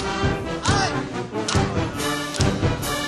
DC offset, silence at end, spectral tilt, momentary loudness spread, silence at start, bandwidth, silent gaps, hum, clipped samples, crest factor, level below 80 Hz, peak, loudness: under 0.1%; 0 s; -4.5 dB/octave; 5 LU; 0 s; 13 kHz; none; none; under 0.1%; 22 dB; -36 dBFS; -2 dBFS; -23 LUFS